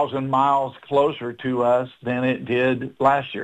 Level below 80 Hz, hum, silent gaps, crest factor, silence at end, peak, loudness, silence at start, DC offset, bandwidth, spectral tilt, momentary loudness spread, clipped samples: -60 dBFS; none; none; 18 dB; 0 s; -4 dBFS; -21 LUFS; 0 s; under 0.1%; 9.2 kHz; -7.5 dB/octave; 5 LU; under 0.1%